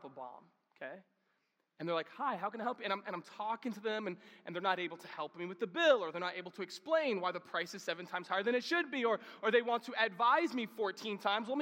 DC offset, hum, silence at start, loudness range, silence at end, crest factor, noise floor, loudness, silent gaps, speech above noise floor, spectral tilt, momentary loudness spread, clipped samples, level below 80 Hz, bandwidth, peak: under 0.1%; none; 0.05 s; 7 LU; 0 s; 20 dB; -81 dBFS; -36 LUFS; none; 44 dB; -4 dB/octave; 14 LU; under 0.1%; under -90 dBFS; 16.5 kHz; -16 dBFS